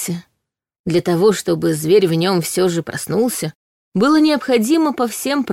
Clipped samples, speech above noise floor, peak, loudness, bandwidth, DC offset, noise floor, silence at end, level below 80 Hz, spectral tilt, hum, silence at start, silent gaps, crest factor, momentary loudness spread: under 0.1%; 60 dB; -2 dBFS; -17 LUFS; 16.5 kHz; under 0.1%; -76 dBFS; 0 s; -58 dBFS; -5 dB/octave; none; 0 s; 0.79-0.84 s, 3.55-3.92 s; 14 dB; 11 LU